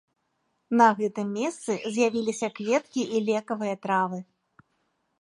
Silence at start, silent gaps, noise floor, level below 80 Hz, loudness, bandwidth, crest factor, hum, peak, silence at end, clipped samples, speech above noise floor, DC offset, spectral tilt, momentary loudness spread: 0.7 s; none; -75 dBFS; -76 dBFS; -26 LUFS; 11.5 kHz; 22 dB; none; -6 dBFS; 1 s; under 0.1%; 49 dB; under 0.1%; -5 dB/octave; 10 LU